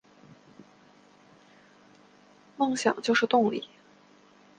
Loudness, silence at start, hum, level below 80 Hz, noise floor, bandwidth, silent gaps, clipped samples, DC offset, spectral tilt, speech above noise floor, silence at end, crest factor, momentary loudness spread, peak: -26 LUFS; 2.6 s; none; -76 dBFS; -58 dBFS; 9.8 kHz; none; under 0.1%; under 0.1%; -4 dB/octave; 33 dB; 0.95 s; 22 dB; 12 LU; -8 dBFS